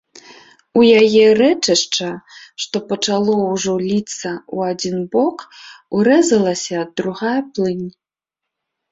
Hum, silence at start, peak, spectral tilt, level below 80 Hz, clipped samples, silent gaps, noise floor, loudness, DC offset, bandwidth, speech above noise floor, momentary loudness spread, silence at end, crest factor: none; 0.75 s; -2 dBFS; -4 dB/octave; -60 dBFS; under 0.1%; none; -83 dBFS; -16 LUFS; under 0.1%; 8 kHz; 67 dB; 16 LU; 1 s; 16 dB